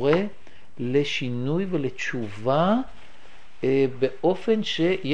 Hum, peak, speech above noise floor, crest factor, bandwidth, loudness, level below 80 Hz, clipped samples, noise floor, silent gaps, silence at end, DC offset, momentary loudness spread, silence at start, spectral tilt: none; -6 dBFS; 29 dB; 18 dB; 9.4 kHz; -25 LUFS; -58 dBFS; under 0.1%; -52 dBFS; none; 0 s; 2%; 7 LU; 0 s; -6.5 dB/octave